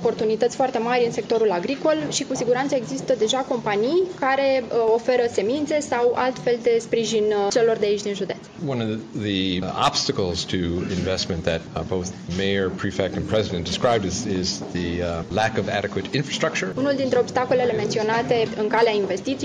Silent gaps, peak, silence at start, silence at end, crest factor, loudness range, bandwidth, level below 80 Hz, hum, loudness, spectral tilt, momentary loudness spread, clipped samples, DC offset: none; -4 dBFS; 0 s; 0 s; 18 dB; 3 LU; 10 kHz; -54 dBFS; none; -22 LUFS; -4.5 dB/octave; 6 LU; under 0.1%; under 0.1%